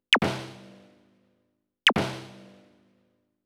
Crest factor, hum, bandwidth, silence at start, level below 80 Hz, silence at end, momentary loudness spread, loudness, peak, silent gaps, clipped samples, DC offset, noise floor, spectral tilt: 26 dB; none; 16.5 kHz; 0.1 s; -60 dBFS; 1.05 s; 23 LU; -25 LUFS; -4 dBFS; none; under 0.1%; under 0.1%; -75 dBFS; -3.5 dB/octave